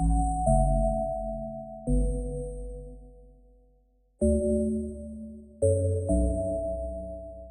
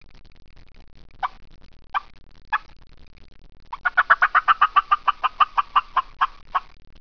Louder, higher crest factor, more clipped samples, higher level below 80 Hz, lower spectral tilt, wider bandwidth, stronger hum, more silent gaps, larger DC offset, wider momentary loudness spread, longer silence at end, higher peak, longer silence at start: second, -29 LUFS vs -21 LUFS; about the same, 18 dB vs 22 dB; neither; first, -32 dBFS vs -48 dBFS; first, -11.5 dB/octave vs -2.5 dB/octave; first, 10 kHz vs 5.4 kHz; neither; neither; second, under 0.1% vs 0.4%; about the same, 16 LU vs 14 LU; second, 0 s vs 0.4 s; second, -10 dBFS vs -2 dBFS; second, 0 s vs 1.2 s